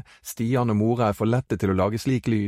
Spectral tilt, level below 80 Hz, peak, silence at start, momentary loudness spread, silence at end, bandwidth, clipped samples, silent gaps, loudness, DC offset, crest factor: -7 dB/octave; -52 dBFS; -8 dBFS; 0.25 s; 4 LU; 0 s; 16 kHz; under 0.1%; none; -23 LUFS; under 0.1%; 14 dB